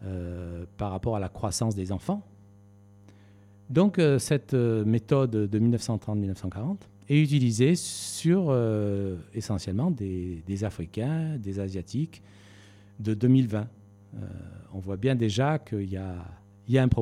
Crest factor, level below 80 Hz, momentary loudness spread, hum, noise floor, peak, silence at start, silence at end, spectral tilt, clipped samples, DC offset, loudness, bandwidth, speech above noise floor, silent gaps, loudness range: 18 dB; -52 dBFS; 15 LU; none; -54 dBFS; -8 dBFS; 0 s; 0 s; -6.5 dB/octave; under 0.1%; under 0.1%; -27 LUFS; 14 kHz; 28 dB; none; 6 LU